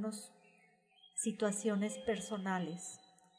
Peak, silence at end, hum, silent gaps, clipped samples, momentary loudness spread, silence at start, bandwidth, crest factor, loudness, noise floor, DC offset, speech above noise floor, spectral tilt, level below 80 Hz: -20 dBFS; 0.4 s; none; none; under 0.1%; 13 LU; 0 s; 11 kHz; 20 dB; -39 LUFS; -69 dBFS; under 0.1%; 31 dB; -4.5 dB/octave; -76 dBFS